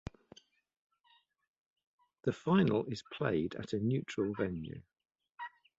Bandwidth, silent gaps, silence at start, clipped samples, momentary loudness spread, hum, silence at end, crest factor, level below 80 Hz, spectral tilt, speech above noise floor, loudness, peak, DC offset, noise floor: 8 kHz; none; 2.25 s; under 0.1%; 19 LU; none; 0.3 s; 22 dB; -62 dBFS; -7.5 dB/octave; 37 dB; -35 LUFS; -16 dBFS; under 0.1%; -71 dBFS